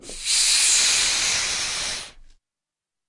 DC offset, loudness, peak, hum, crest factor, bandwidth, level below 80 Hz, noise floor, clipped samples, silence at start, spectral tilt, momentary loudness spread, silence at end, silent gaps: under 0.1%; -18 LUFS; -6 dBFS; none; 18 dB; 11.5 kHz; -48 dBFS; -88 dBFS; under 0.1%; 0.05 s; 2.5 dB/octave; 11 LU; 0.8 s; none